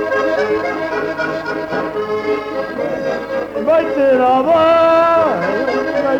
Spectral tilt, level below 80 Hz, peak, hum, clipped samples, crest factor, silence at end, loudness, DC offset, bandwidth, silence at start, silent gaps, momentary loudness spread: -6 dB/octave; -50 dBFS; -4 dBFS; none; under 0.1%; 12 dB; 0 s; -16 LUFS; under 0.1%; 9 kHz; 0 s; none; 10 LU